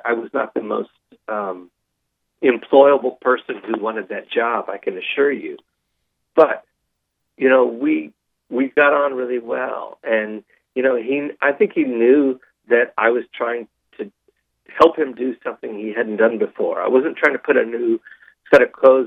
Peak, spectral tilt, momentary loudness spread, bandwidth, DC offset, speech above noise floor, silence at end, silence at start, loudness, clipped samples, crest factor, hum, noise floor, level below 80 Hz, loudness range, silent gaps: 0 dBFS; -6.5 dB/octave; 14 LU; 6.8 kHz; under 0.1%; 57 dB; 0 s; 0.05 s; -18 LUFS; under 0.1%; 18 dB; none; -74 dBFS; -64 dBFS; 3 LU; none